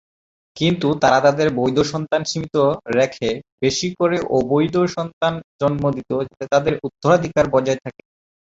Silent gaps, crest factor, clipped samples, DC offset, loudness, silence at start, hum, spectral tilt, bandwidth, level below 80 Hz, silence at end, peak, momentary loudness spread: 3.52-3.58 s, 5.13-5.21 s, 5.44-5.59 s; 18 dB; under 0.1%; under 0.1%; -19 LUFS; 0.55 s; none; -5.5 dB/octave; 8 kHz; -50 dBFS; 0.55 s; -2 dBFS; 7 LU